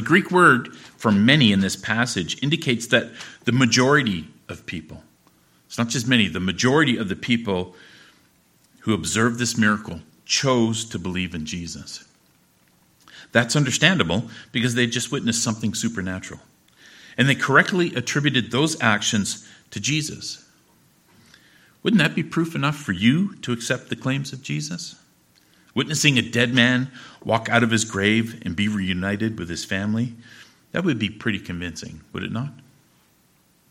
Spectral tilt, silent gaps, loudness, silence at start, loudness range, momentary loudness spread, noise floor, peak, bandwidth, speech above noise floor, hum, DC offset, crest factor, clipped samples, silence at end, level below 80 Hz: -4 dB/octave; none; -21 LUFS; 0 s; 6 LU; 16 LU; -60 dBFS; 0 dBFS; 16 kHz; 39 dB; none; under 0.1%; 22 dB; under 0.1%; 1.2 s; -56 dBFS